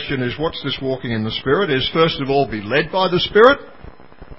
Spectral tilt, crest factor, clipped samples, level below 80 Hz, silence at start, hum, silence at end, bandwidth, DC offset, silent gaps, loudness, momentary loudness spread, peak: -7.5 dB/octave; 18 dB; under 0.1%; -44 dBFS; 0 s; none; 0.05 s; 5.8 kHz; 0.9%; none; -17 LUFS; 10 LU; 0 dBFS